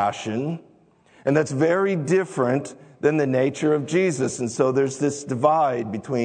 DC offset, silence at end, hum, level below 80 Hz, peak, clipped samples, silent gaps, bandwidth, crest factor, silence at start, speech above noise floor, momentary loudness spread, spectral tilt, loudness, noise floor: under 0.1%; 0 s; none; -68 dBFS; -4 dBFS; under 0.1%; none; 9.4 kHz; 18 dB; 0 s; 34 dB; 7 LU; -6 dB/octave; -22 LUFS; -56 dBFS